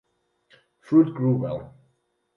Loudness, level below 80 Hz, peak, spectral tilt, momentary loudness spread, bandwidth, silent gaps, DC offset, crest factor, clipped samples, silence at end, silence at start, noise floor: -22 LUFS; -60 dBFS; -8 dBFS; -11 dB/octave; 12 LU; 5.2 kHz; none; under 0.1%; 18 dB; under 0.1%; 0.7 s; 0.9 s; -70 dBFS